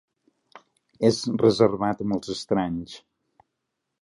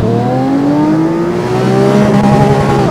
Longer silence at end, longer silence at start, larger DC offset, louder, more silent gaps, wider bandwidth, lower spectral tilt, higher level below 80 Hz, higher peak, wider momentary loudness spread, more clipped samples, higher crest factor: first, 1.05 s vs 0 s; first, 1 s vs 0 s; neither; second, -24 LUFS vs -10 LUFS; neither; second, 11.5 kHz vs 13.5 kHz; second, -6 dB/octave vs -7.5 dB/octave; second, -58 dBFS vs -32 dBFS; second, -4 dBFS vs 0 dBFS; first, 14 LU vs 4 LU; neither; first, 22 dB vs 10 dB